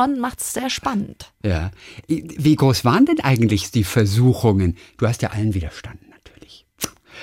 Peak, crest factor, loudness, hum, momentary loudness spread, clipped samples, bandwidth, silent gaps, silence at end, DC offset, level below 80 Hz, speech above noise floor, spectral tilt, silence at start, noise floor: -4 dBFS; 16 dB; -19 LUFS; none; 13 LU; under 0.1%; 17 kHz; none; 0 s; under 0.1%; -44 dBFS; 28 dB; -6 dB/octave; 0 s; -47 dBFS